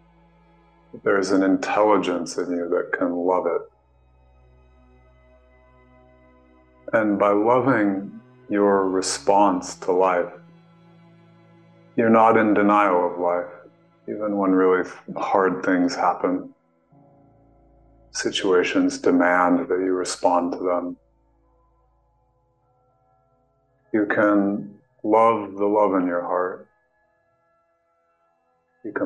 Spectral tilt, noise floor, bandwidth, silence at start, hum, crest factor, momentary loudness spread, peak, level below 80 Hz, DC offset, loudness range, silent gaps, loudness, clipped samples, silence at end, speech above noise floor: -5 dB/octave; -67 dBFS; 10 kHz; 0.95 s; none; 20 dB; 12 LU; -4 dBFS; -62 dBFS; under 0.1%; 7 LU; none; -21 LUFS; under 0.1%; 0 s; 47 dB